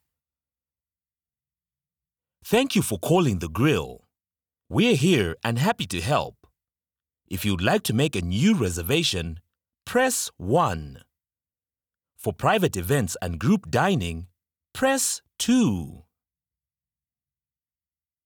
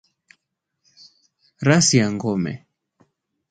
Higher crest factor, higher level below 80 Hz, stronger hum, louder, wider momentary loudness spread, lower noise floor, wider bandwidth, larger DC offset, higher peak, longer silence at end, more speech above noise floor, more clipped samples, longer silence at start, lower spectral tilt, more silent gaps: about the same, 20 dB vs 24 dB; first, -52 dBFS vs -58 dBFS; neither; second, -23 LUFS vs -19 LUFS; about the same, 13 LU vs 14 LU; first, under -90 dBFS vs -77 dBFS; first, over 20 kHz vs 9.6 kHz; neither; second, -6 dBFS vs 0 dBFS; first, 2.25 s vs 0.95 s; first, over 67 dB vs 59 dB; neither; first, 2.45 s vs 1.6 s; about the same, -5 dB/octave vs -4 dB/octave; neither